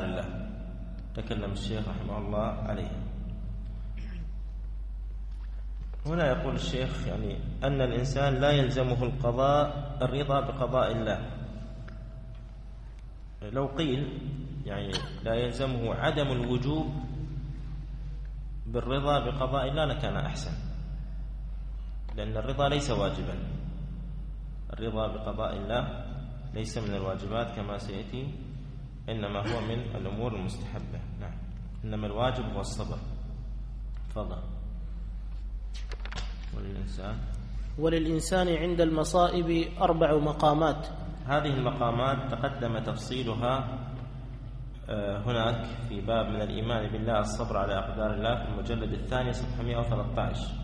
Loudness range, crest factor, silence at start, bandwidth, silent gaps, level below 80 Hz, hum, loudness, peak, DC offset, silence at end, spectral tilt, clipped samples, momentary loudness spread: 9 LU; 20 dB; 0 s; 11 kHz; none; -38 dBFS; none; -32 LUFS; -10 dBFS; under 0.1%; 0 s; -6.5 dB/octave; under 0.1%; 14 LU